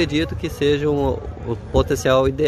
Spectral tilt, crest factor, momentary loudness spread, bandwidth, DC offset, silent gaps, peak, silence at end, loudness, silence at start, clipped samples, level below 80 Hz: -6 dB/octave; 16 dB; 11 LU; 14 kHz; under 0.1%; none; -4 dBFS; 0 s; -20 LUFS; 0 s; under 0.1%; -32 dBFS